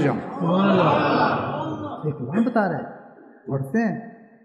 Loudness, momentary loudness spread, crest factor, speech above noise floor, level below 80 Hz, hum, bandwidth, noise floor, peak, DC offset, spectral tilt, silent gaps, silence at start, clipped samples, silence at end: -22 LUFS; 14 LU; 16 dB; 25 dB; -64 dBFS; none; 11.5 kHz; -46 dBFS; -6 dBFS; under 0.1%; -8 dB/octave; none; 0 s; under 0.1%; 0.2 s